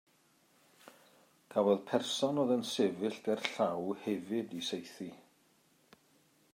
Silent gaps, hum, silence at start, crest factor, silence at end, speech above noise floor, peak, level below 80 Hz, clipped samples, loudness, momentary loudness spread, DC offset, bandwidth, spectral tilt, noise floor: none; none; 0.85 s; 24 dB; 1.4 s; 36 dB; -12 dBFS; -88 dBFS; under 0.1%; -34 LUFS; 9 LU; under 0.1%; 16 kHz; -4.5 dB/octave; -70 dBFS